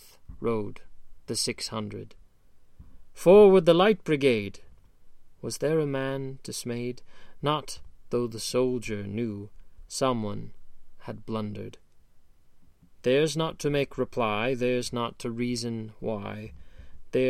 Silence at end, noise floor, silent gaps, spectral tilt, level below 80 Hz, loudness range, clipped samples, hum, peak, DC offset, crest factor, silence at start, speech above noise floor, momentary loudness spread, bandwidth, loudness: 0 s; -53 dBFS; none; -5 dB/octave; -52 dBFS; 11 LU; under 0.1%; none; -8 dBFS; under 0.1%; 20 dB; 0.05 s; 27 dB; 20 LU; 14.5 kHz; -27 LUFS